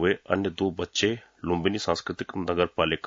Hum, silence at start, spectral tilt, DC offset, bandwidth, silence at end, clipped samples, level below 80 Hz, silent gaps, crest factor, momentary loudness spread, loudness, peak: none; 0 s; -4.5 dB/octave; under 0.1%; 7.6 kHz; 0 s; under 0.1%; -56 dBFS; none; 20 dB; 6 LU; -27 LUFS; -8 dBFS